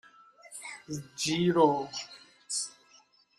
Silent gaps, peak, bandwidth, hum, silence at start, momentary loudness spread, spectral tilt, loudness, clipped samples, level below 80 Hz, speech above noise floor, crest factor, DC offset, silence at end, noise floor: none; -10 dBFS; 13 kHz; none; 0.5 s; 20 LU; -4 dB/octave; -30 LUFS; under 0.1%; -72 dBFS; 34 dB; 22 dB; under 0.1%; 0.7 s; -62 dBFS